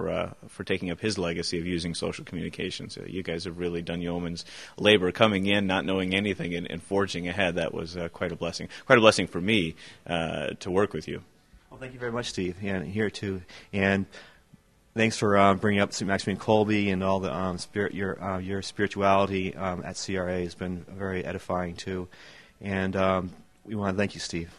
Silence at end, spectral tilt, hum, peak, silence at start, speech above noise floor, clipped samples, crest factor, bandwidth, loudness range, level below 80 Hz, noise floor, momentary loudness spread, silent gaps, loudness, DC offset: 0 s; -5 dB/octave; none; -2 dBFS; 0 s; 31 dB; under 0.1%; 26 dB; 12.5 kHz; 6 LU; -56 dBFS; -59 dBFS; 14 LU; none; -27 LUFS; 0.2%